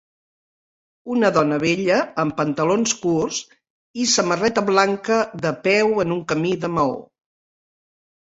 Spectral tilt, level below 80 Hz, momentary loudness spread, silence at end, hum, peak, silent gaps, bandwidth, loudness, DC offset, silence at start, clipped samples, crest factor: -4 dB/octave; -58 dBFS; 6 LU; 1.25 s; none; -2 dBFS; 3.70-3.94 s; 8 kHz; -20 LUFS; under 0.1%; 1.05 s; under 0.1%; 20 dB